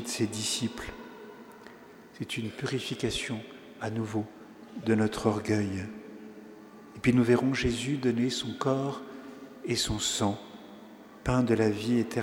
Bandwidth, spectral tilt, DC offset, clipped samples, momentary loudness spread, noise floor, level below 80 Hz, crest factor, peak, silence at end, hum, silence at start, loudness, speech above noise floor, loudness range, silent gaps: 18.5 kHz; -5 dB/octave; under 0.1%; under 0.1%; 22 LU; -51 dBFS; -52 dBFS; 22 dB; -10 dBFS; 0 s; none; 0 s; -29 LUFS; 22 dB; 6 LU; none